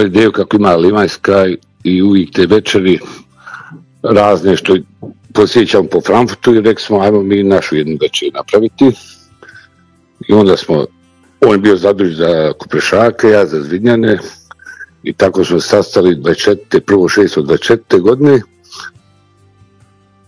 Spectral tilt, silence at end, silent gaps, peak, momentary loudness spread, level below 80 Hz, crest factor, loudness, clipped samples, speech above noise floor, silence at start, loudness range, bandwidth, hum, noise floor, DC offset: -6 dB/octave; 1.4 s; none; 0 dBFS; 11 LU; -46 dBFS; 10 dB; -10 LUFS; 2%; 40 dB; 0 s; 3 LU; 11 kHz; none; -50 dBFS; under 0.1%